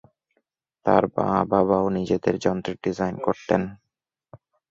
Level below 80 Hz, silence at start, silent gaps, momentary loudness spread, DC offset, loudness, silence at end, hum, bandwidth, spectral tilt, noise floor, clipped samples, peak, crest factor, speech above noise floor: -54 dBFS; 0.85 s; none; 7 LU; under 0.1%; -23 LUFS; 0.35 s; none; 7.8 kHz; -7.5 dB/octave; -83 dBFS; under 0.1%; -2 dBFS; 22 dB; 61 dB